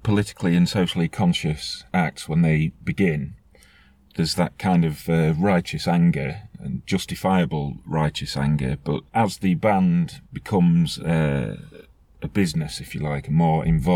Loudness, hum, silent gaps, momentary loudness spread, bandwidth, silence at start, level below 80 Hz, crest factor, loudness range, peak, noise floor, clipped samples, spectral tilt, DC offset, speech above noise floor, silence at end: -22 LUFS; none; none; 10 LU; 14.5 kHz; 0.05 s; -42 dBFS; 16 dB; 2 LU; -6 dBFS; -54 dBFS; under 0.1%; -6.5 dB/octave; under 0.1%; 33 dB; 0 s